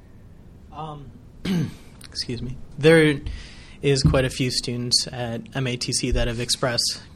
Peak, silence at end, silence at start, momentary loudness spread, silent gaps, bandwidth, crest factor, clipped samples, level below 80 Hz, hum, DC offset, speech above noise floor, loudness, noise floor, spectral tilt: -2 dBFS; 0 s; 0.15 s; 19 LU; none; 14 kHz; 20 dB; under 0.1%; -36 dBFS; none; under 0.1%; 23 dB; -22 LUFS; -45 dBFS; -4 dB/octave